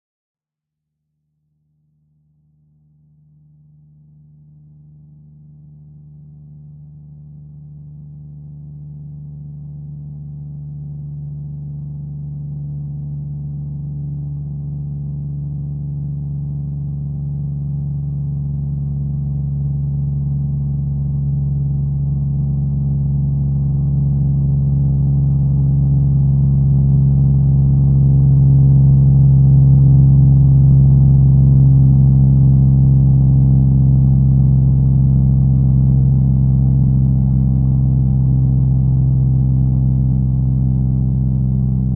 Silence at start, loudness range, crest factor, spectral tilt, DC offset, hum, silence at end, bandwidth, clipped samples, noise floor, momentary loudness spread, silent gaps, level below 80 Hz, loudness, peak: 6.3 s; 18 LU; 14 dB; -18 dB/octave; under 0.1%; none; 0 s; 1.1 kHz; under 0.1%; -83 dBFS; 18 LU; none; -24 dBFS; -14 LUFS; -2 dBFS